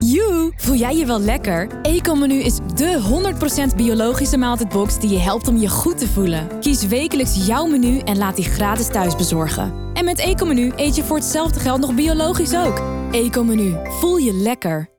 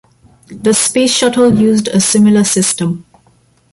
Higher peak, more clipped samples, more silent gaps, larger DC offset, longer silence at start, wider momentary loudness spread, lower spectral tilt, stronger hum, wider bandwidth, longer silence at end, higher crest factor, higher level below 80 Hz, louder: second, -4 dBFS vs 0 dBFS; neither; neither; neither; second, 0 s vs 0.5 s; second, 3 LU vs 8 LU; about the same, -5 dB/octave vs -4 dB/octave; neither; first, over 20 kHz vs 11.5 kHz; second, 0.1 s vs 0.75 s; about the same, 14 dB vs 12 dB; first, -26 dBFS vs -48 dBFS; second, -18 LUFS vs -11 LUFS